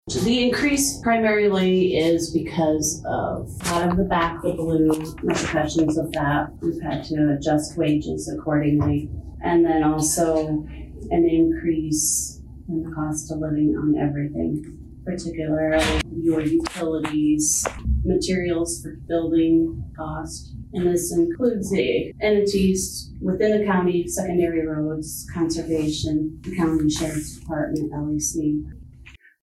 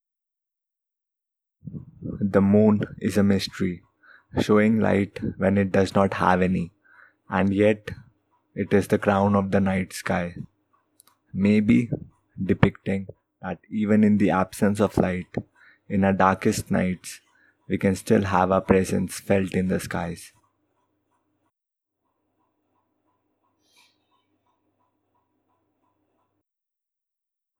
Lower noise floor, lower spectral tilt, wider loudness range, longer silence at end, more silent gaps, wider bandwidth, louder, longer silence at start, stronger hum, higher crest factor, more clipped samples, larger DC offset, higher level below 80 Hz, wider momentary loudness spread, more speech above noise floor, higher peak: second, -47 dBFS vs -87 dBFS; second, -5 dB/octave vs -7 dB/octave; about the same, 3 LU vs 3 LU; second, 0.25 s vs 7.3 s; neither; about the same, 13.5 kHz vs 14 kHz; about the same, -22 LUFS vs -23 LUFS; second, 0.05 s vs 1.65 s; neither; second, 12 dB vs 24 dB; neither; neither; first, -38 dBFS vs -52 dBFS; second, 10 LU vs 17 LU; second, 25 dB vs 65 dB; second, -10 dBFS vs 0 dBFS